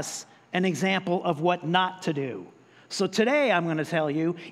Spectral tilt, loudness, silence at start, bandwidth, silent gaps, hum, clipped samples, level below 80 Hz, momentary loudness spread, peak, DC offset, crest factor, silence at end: -5 dB/octave; -26 LUFS; 0 s; 14 kHz; none; none; under 0.1%; -78 dBFS; 12 LU; -8 dBFS; under 0.1%; 18 dB; 0 s